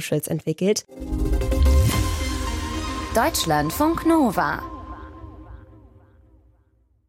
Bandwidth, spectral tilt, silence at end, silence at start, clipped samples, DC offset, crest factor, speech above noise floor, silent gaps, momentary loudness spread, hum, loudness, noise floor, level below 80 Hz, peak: 16.5 kHz; -5 dB/octave; 1.5 s; 0 s; under 0.1%; under 0.1%; 16 dB; 40 dB; none; 19 LU; none; -22 LUFS; -61 dBFS; -28 dBFS; -8 dBFS